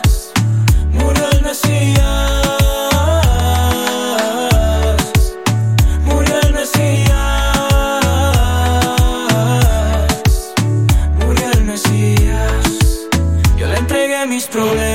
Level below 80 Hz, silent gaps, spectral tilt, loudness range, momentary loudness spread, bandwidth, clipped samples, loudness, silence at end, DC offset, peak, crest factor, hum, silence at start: -16 dBFS; none; -5 dB/octave; 1 LU; 3 LU; 16.5 kHz; under 0.1%; -14 LUFS; 0 s; 0.4%; -2 dBFS; 12 dB; none; 0 s